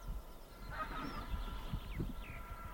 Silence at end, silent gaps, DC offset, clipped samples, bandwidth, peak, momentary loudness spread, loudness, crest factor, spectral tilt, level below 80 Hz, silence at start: 0 s; none; under 0.1%; under 0.1%; 17 kHz; -28 dBFS; 8 LU; -46 LUFS; 16 dB; -6 dB/octave; -46 dBFS; 0 s